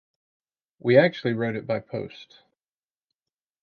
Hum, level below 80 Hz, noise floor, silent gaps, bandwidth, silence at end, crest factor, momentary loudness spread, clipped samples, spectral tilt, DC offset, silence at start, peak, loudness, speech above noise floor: none; -68 dBFS; under -90 dBFS; none; 6.6 kHz; 1.4 s; 24 dB; 16 LU; under 0.1%; -8.5 dB/octave; under 0.1%; 0.85 s; -4 dBFS; -24 LUFS; over 66 dB